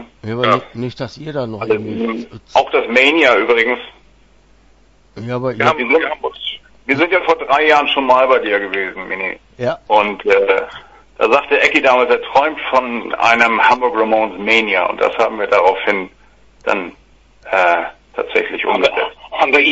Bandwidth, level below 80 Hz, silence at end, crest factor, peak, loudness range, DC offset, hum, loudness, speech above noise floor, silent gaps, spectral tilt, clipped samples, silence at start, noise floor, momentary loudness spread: 8 kHz; -50 dBFS; 0 s; 16 dB; 0 dBFS; 5 LU; under 0.1%; none; -14 LUFS; 35 dB; none; -4.5 dB/octave; under 0.1%; 0 s; -49 dBFS; 13 LU